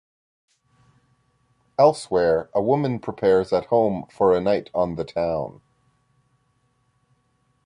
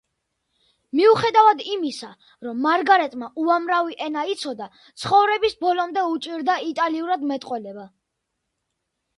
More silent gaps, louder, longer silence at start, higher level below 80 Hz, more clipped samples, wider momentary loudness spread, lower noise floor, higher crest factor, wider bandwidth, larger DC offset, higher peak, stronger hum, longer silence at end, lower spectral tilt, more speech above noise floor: neither; about the same, -22 LUFS vs -21 LUFS; first, 1.8 s vs 0.95 s; first, -54 dBFS vs -66 dBFS; neither; second, 7 LU vs 16 LU; second, -67 dBFS vs -78 dBFS; about the same, 20 dB vs 20 dB; about the same, 11 kHz vs 11.5 kHz; neither; about the same, -4 dBFS vs -2 dBFS; neither; first, 2.15 s vs 1.3 s; first, -7 dB/octave vs -4.5 dB/octave; second, 46 dB vs 57 dB